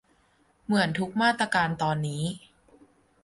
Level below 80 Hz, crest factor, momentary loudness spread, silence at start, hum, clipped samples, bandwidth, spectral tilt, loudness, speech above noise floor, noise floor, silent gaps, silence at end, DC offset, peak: -60 dBFS; 18 dB; 10 LU; 0.7 s; none; under 0.1%; 11.5 kHz; -5 dB/octave; -26 LUFS; 39 dB; -65 dBFS; none; 0.85 s; under 0.1%; -10 dBFS